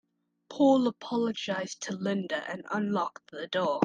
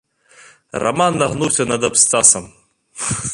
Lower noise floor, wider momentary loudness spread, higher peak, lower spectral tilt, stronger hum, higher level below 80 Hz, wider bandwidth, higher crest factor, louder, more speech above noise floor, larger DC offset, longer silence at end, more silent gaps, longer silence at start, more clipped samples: first, -54 dBFS vs -47 dBFS; about the same, 12 LU vs 12 LU; second, -8 dBFS vs 0 dBFS; first, -5 dB/octave vs -2.5 dB/octave; neither; second, -74 dBFS vs -48 dBFS; second, 9.6 kHz vs 15 kHz; about the same, 22 dB vs 18 dB; second, -30 LUFS vs -15 LUFS; second, 25 dB vs 31 dB; neither; about the same, 0 s vs 0 s; neither; second, 0.5 s vs 0.75 s; neither